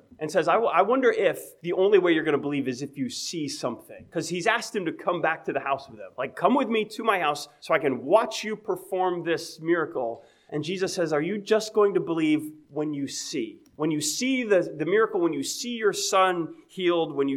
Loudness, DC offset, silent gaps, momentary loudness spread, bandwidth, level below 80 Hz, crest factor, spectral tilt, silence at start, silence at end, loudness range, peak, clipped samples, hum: -26 LUFS; under 0.1%; none; 11 LU; 16.5 kHz; -74 dBFS; 20 dB; -4 dB/octave; 0.2 s; 0 s; 4 LU; -6 dBFS; under 0.1%; none